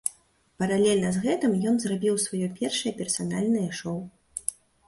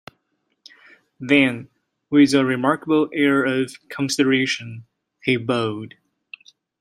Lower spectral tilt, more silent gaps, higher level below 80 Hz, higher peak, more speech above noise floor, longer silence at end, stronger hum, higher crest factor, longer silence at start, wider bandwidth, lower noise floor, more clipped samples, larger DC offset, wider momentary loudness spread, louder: about the same, -4.5 dB/octave vs -5 dB/octave; neither; about the same, -62 dBFS vs -66 dBFS; second, -8 dBFS vs -2 dBFS; second, 34 dB vs 52 dB; second, 0.35 s vs 0.95 s; neither; about the same, 20 dB vs 20 dB; second, 0.05 s vs 1.2 s; about the same, 12 kHz vs 13 kHz; second, -59 dBFS vs -71 dBFS; neither; neither; second, 10 LU vs 18 LU; second, -27 LUFS vs -20 LUFS